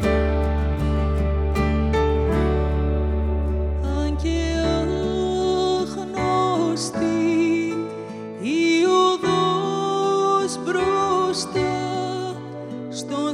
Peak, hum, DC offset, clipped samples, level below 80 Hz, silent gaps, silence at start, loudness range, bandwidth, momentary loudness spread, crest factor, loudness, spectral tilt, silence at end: -6 dBFS; none; under 0.1%; under 0.1%; -28 dBFS; none; 0 s; 3 LU; 11.5 kHz; 8 LU; 14 dB; -22 LUFS; -6 dB/octave; 0 s